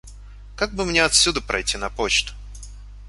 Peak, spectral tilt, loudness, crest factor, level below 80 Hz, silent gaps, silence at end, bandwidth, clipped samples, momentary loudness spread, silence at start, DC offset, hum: -2 dBFS; -1.5 dB/octave; -20 LUFS; 22 dB; -38 dBFS; none; 0 s; 11.5 kHz; under 0.1%; 23 LU; 0.05 s; under 0.1%; 50 Hz at -35 dBFS